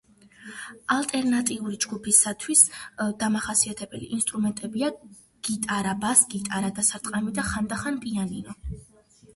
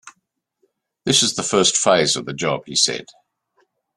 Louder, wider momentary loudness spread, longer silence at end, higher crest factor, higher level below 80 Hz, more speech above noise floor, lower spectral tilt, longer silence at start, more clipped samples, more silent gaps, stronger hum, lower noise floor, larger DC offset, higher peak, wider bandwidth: second, -24 LUFS vs -17 LUFS; first, 17 LU vs 8 LU; second, 0.5 s vs 0.95 s; about the same, 24 dB vs 20 dB; first, -50 dBFS vs -60 dBFS; second, 21 dB vs 54 dB; about the same, -2.5 dB/octave vs -2 dB/octave; first, 0.4 s vs 0.05 s; neither; neither; neither; second, -47 dBFS vs -73 dBFS; neither; about the same, -2 dBFS vs -2 dBFS; second, 12 kHz vs 13.5 kHz